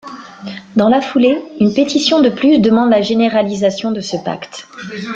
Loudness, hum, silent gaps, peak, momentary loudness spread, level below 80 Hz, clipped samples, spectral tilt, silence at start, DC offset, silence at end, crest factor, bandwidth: -13 LUFS; none; none; 0 dBFS; 18 LU; -54 dBFS; under 0.1%; -5.5 dB/octave; 0.05 s; under 0.1%; 0 s; 14 dB; 7.8 kHz